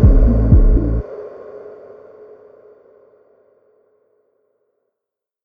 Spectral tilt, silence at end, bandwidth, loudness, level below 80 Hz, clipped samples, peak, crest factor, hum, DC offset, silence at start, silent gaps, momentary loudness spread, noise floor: -12.5 dB/octave; 3.75 s; 2.2 kHz; -15 LUFS; -18 dBFS; under 0.1%; 0 dBFS; 18 dB; none; under 0.1%; 0 s; none; 28 LU; -83 dBFS